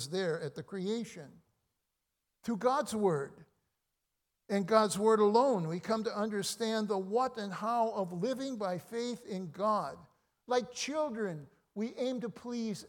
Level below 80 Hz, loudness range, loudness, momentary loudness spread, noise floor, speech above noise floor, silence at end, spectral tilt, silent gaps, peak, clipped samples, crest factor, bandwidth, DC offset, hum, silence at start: -78 dBFS; 6 LU; -33 LUFS; 12 LU; -85 dBFS; 52 dB; 0 s; -5 dB/octave; none; -12 dBFS; under 0.1%; 22 dB; 18 kHz; under 0.1%; none; 0 s